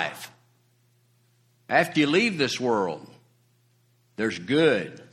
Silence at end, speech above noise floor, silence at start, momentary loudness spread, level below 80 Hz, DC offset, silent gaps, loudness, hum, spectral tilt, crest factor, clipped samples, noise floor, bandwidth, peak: 0.1 s; 41 dB; 0 s; 19 LU; -68 dBFS; under 0.1%; none; -24 LUFS; none; -4.5 dB/octave; 22 dB; under 0.1%; -64 dBFS; 14.5 kHz; -6 dBFS